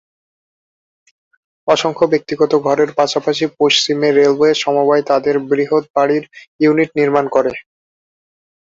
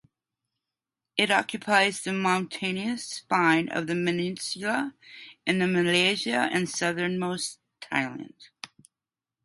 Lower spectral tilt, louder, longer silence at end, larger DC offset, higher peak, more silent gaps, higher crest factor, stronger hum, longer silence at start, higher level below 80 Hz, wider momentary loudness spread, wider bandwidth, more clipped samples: about the same, -4.5 dB/octave vs -4 dB/octave; first, -14 LUFS vs -26 LUFS; first, 1 s vs 0.8 s; neither; first, 0 dBFS vs -6 dBFS; first, 5.90-5.94 s, 6.47-6.59 s vs none; second, 14 dB vs 22 dB; neither; first, 1.65 s vs 1.15 s; first, -60 dBFS vs -72 dBFS; second, 5 LU vs 20 LU; second, 7.8 kHz vs 11.5 kHz; neither